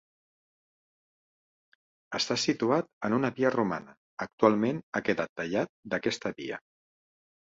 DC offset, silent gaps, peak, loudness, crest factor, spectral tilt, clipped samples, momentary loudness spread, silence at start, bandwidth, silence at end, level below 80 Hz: under 0.1%; 2.93-3.01 s, 3.97-4.17 s, 4.33-4.38 s, 4.83-4.92 s, 5.29-5.36 s, 5.69-5.83 s; -8 dBFS; -30 LUFS; 24 dB; -5 dB/octave; under 0.1%; 13 LU; 2.1 s; 8 kHz; 0.9 s; -70 dBFS